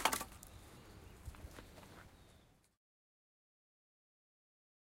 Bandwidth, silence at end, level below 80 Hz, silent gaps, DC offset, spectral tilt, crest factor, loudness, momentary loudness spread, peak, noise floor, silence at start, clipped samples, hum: 16 kHz; 2.4 s; -64 dBFS; none; under 0.1%; -2 dB/octave; 34 dB; -48 LUFS; 20 LU; -16 dBFS; -68 dBFS; 0 s; under 0.1%; none